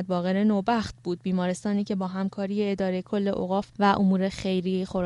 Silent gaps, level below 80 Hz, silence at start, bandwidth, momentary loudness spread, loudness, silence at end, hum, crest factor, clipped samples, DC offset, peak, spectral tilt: none; -56 dBFS; 0 s; 11.5 kHz; 6 LU; -26 LUFS; 0 s; none; 18 dB; under 0.1%; under 0.1%; -8 dBFS; -7 dB/octave